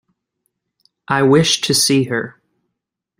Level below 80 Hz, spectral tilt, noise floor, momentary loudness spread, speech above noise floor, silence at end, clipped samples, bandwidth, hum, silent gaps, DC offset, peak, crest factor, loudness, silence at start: -56 dBFS; -3.5 dB/octave; -79 dBFS; 10 LU; 64 dB; 0.9 s; under 0.1%; 16 kHz; none; none; under 0.1%; -2 dBFS; 18 dB; -14 LUFS; 1.1 s